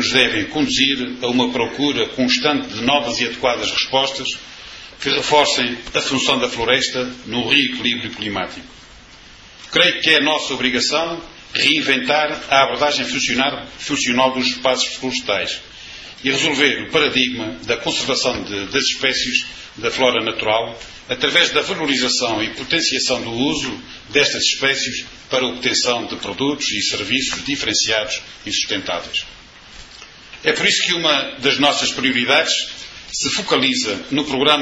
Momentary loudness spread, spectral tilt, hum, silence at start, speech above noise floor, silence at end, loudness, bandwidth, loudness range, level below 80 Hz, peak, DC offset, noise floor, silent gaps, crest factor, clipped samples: 11 LU; -2 dB/octave; none; 0 s; 24 dB; 0 s; -17 LUFS; 10.5 kHz; 3 LU; -50 dBFS; 0 dBFS; under 0.1%; -42 dBFS; none; 20 dB; under 0.1%